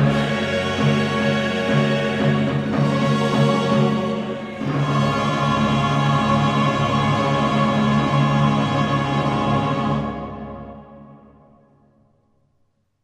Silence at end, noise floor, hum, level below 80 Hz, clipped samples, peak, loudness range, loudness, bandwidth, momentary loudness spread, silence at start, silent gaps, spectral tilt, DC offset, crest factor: 1.85 s; -65 dBFS; none; -44 dBFS; under 0.1%; -6 dBFS; 6 LU; -19 LUFS; 10 kHz; 7 LU; 0 s; none; -6.5 dB/octave; under 0.1%; 14 dB